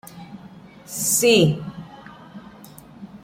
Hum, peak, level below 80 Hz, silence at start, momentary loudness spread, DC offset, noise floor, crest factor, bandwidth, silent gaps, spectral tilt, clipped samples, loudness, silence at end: none; -4 dBFS; -56 dBFS; 0.05 s; 27 LU; under 0.1%; -44 dBFS; 20 dB; 16.5 kHz; none; -3.5 dB/octave; under 0.1%; -18 LUFS; 0.05 s